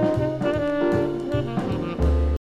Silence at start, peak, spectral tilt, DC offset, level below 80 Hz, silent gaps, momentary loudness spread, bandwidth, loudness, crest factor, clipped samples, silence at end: 0 s; -10 dBFS; -8.5 dB/octave; under 0.1%; -28 dBFS; none; 4 LU; 9 kHz; -24 LUFS; 14 dB; under 0.1%; 0.05 s